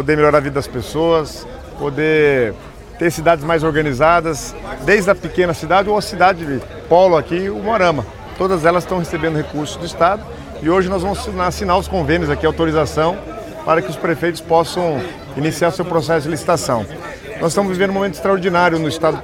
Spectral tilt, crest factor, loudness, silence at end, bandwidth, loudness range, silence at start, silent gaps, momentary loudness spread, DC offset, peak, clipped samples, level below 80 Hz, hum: -5.5 dB/octave; 16 dB; -16 LUFS; 0 s; 17 kHz; 3 LU; 0 s; none; 11 LU; under 0.1%; 0 dBFS; under 0.1%; -38 dBFS; none